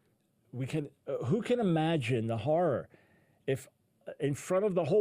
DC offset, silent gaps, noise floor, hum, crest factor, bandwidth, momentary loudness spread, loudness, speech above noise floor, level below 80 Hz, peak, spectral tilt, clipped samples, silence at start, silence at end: under 0.1%; none; -72 dBFS; none; 14 dB; 15.5 kHz; 13 LU; -32 LUFS; 41 dB; -68 dBFS; -18 dBFS; -7 dB/octave; under 0.1%; 0.55 s; 0 s